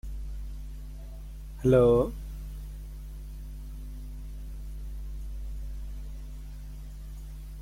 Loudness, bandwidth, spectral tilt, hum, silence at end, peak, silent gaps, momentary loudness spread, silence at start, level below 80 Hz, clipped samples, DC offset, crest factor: -30 LUFS; 16.5 kHz; -8.5 dB/octave; none; 0 s; -10 dBFS; none; 20 LU; 0.05 s; -38 dBFS; under 0.1%; under 0.1%; 22 dB